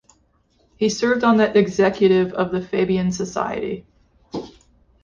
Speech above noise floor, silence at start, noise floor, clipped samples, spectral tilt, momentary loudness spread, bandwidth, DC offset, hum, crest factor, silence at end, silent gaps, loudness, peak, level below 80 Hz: 43 dB; 0.8 s; -61 dBFS; under 0.1%; -5.5 dB/octave; 17 LU; 7.6 kHz; under 0.1%; none; 16 dB; 0.55 s; none; -19 LUFS; -4 dBFS; -52 dBFS